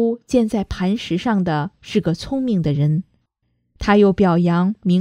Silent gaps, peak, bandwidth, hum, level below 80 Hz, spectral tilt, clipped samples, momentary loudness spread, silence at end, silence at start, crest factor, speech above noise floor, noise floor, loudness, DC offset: none; -2 dBFS; 10.5 kHz; none; -42 dBFS; -7.5 dB/octave; under 0.1%; 8 LU; 0 s; 0 s; 16 dB; 51 dB; -69 dBFS; -19 LUFS; under 0.1%